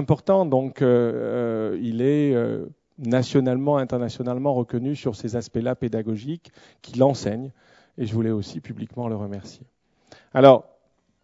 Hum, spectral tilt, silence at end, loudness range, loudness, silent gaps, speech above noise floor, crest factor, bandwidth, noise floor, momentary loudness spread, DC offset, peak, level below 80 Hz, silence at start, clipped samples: none; -7.5 dB/octave; 0.6 s; 5 LU; -22 LUFS; none; 43 dB; 22 dB; 7.8 kHz; -65 dBFS; 14 LU; under 0.1%; 0 dBFS; -58 dBFS; 0 s; under 0.1%